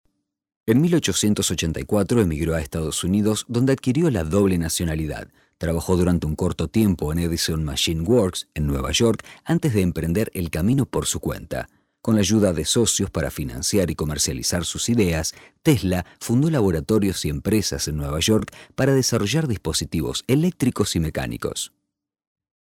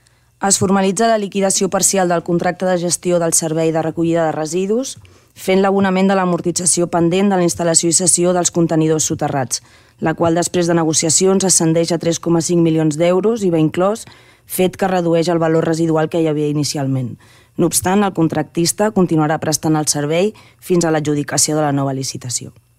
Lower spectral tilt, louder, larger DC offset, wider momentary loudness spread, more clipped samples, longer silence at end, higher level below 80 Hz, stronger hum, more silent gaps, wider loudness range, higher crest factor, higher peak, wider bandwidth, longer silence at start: about the same, -5 dB/octave vs -4.5 dB/octave; second, -22 LUFS vs -15 LUFS; neither; about the same, 8 LU vs 8 LU; neither; first, 1 s vs 0.3 s; first, -38 dBFS vs -52 dBFS; neither; neither; about the same, 2 LU vs 3 LU; about the same, 16 dB vs 16 dB; second, -6 dBFS vs 0 dBFS; about the same, 17 kHz vs 16 kHz; first, 0.65 s vs 0.4 s